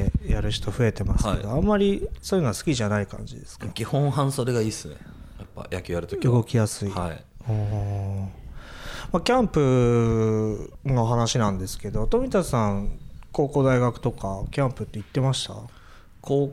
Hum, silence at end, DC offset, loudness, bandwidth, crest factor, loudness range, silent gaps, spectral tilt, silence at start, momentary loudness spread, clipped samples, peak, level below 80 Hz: none; 0 s; under 0.1%; -25 LUFS; 15 kHz; 16 dB; 4 LU; none; -6.5 dB/octave; 0 s; 16 LU; under 0.1%; -8 dBFS; -36 dBFS